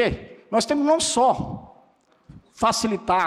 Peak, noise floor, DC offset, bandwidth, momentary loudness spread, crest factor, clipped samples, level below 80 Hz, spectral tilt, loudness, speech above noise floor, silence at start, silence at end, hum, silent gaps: -10 dBFS; -59 dBFS; under 0.1%; 14.5 kHz; 14 LU; 14 dB; under 0.1%; -48 dBFS; -3.5 dB/octave; -22 LUFS; 38 dB; 0 s; 0 s; none; none